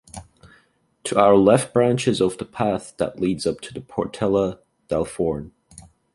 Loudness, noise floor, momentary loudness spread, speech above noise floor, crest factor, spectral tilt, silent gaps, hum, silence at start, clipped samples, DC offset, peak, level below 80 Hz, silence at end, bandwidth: -21 LUFS; -61 dBFS; 16 LU; 41 dB; 20 dB; -6 dB/octave; none; none; 0.15 s; under 0.1%; under 0.1%; -2 dBFS; -50 dBFS; 0.35 s; 11.5 kHz